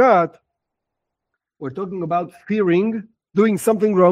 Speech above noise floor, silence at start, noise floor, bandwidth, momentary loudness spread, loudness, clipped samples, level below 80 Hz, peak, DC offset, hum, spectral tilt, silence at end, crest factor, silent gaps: 64 dB; 0 s; -81 dBFS; 16 kHz; 14 LU; -19 LUFS; under 0.1%; -64 dBFS; -2 dBFS; under 0.1%; none; -7 dB/octave; 0 s; 18 dB; none